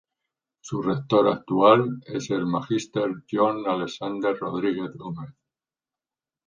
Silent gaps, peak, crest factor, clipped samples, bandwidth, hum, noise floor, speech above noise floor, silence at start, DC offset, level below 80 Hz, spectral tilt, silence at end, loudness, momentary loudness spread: none; -2 dBFS; 22 dB; under 0.1%; 9.4 kHz; none; under -90 dBFS; over 66 dB; 0.65 s; under 0.1%; -64 dBFS; -6.5 dB/octave; 1.15 s; -24 LUFS; 15 LU